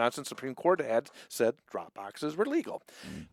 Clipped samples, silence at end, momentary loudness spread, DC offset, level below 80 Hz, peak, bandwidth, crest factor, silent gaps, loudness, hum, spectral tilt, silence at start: under 0.1%; 0.05 s; 15 LU; under 0.1%; -72 dBFS; -10 dBFS; 16.5 kHz; 22 dB; none; -32 LUFS; none; -4.5 dB/octave; 0 s